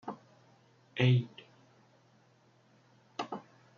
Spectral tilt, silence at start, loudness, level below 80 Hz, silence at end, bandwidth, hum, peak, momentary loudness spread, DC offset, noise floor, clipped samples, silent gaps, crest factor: -6 dB/octave; 0.05 s; -33 LUFS; -78 dBFS; 0.4 s; 6.8 kHz; none; -14 dBFS; 22 LU; under 0.1%; -66 dBFS; under 0.1%; none; 24 dB